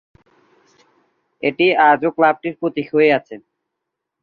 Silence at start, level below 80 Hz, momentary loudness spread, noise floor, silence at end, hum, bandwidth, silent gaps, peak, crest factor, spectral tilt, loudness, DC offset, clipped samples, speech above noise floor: 1.45 s; -64 dBFS; 10 LU; -79 dBFS; 0.85 s; none; 5.2 kHz; none; -2 dBFS; 18 dB; -7.5 dB/octave; -16 LUFS; under 0.1%; under 0.1%; 63 dB